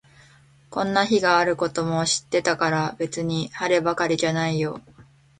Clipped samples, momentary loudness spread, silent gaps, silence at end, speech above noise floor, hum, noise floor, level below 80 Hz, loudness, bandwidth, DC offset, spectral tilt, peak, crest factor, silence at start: under 0.1%; 8 LU; none; 0.35 s; 31 dB; none; -54 dBFS; -58 dBFS; -23 LUFS; 9.6 kHz; under 0.1%; -4 dB/octave; -4 dBFS; 18 dB; 0.7 s